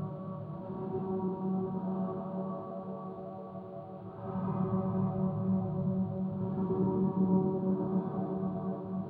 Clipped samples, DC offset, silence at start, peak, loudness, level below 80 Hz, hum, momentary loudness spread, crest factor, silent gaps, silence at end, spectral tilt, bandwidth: under 0.1%; under 0.1%; 0 s; -16 dBFS; -34 LUFS; -64 dBFS; none; 13 LU; 16 dB; none; 0 s; -13 dB/octave; 2.4 kHz